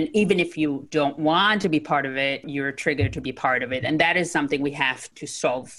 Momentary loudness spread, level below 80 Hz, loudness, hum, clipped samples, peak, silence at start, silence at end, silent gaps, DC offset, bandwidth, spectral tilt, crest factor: 7 LU; -52 dBFS; -23 LUFS; none; under 0.1%; -4 dBFS; 0 s; 0 s; none; under 0.1%; 12 kHz; -4.5 dB/octave; 18 dB